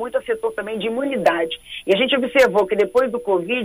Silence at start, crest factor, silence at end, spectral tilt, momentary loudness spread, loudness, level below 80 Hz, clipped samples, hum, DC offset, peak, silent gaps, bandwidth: 0 s; 16 dB; 0 s; -4.5 dB/octave; 9 LU; -19 LUFS; -54 dBFS; under 0.1%; none; under 0.1%; -4 dBFS; none; 15.5 kHz